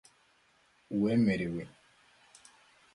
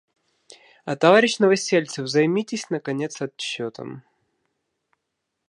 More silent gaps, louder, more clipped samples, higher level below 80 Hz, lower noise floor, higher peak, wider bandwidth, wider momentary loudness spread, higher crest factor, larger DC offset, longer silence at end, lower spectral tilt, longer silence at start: neither; second, -31 LUFS vs -21 LUFS; neither; first, -64 dBFS vs -76 dBFS; second, -68 dBFS vs -79 dBFS; second, -18 dBFS vs -2 dBFS; about the same, 11.5 kHz vs 11.5 kHz; about the same, 14 LU vs 16 LU; about the same, 18 dB vs 22 dB; neither; second, 1.3 s vs 1.5 s; first, -7.5 dB/octave vs -4.5 dB/octave; about the same, 0.9 s vs 0.85 s